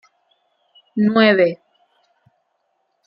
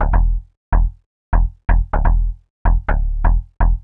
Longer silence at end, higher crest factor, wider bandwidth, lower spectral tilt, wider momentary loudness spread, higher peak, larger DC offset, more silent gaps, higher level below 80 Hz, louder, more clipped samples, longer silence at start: first, 1.5 s vs 0.05 s; about the same, 18 dB vs 14 dB; first, 5.6 kHz vs 2.7 kHz; second, -8.5 dB/octave vs -11.5 dB/octave; first, 17 LU vs 5 LU; second, -4 dBFS vs 0 dBFS; neither; second, none vs 0.57-0.72 s, 1.06-1.32 s, 2.50-2.65 s; second, -70 dBFS vs -16 dBFS; first, -16 LUFS vs -21 LUFS; neither; first, 0.95 s vs 0 s